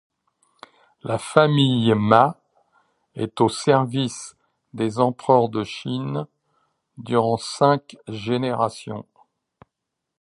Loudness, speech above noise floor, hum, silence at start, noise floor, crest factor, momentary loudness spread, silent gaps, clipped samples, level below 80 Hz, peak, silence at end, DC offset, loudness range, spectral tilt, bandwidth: -21 LUFS; 61 dB; none; 1.05 s; -81 dBFS; 22 dB; 19 LU; none; under 0.1%; -60 dBFS; 0 dBFS; 1.2 s; under 0.1%; 4 LU; -6 dB/octave; 11.5 kHz